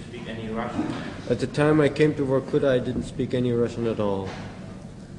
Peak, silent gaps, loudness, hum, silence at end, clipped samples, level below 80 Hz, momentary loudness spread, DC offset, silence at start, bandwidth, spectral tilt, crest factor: -6 dBFS; none; -25 LUFS; none; 0 s; under 0.1%; -48 dBFS; 15 LU; under 0.1%; 0 s; 11 kHz; -7 dB/octave; 18 dB